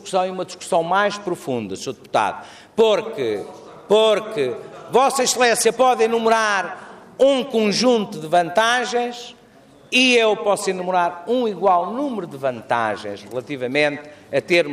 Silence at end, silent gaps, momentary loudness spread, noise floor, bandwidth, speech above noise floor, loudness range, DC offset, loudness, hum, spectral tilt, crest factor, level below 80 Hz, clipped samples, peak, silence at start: 0 s; none; 13 LU; -48 dBFS; 15.5 kHz; 29 dB; 4 LU; under 0.1%; -19 LUFS; none; -3 dB/octave; 16 dB; -64 dBFS; under 0.1%; -4 dBFS; 0.05 s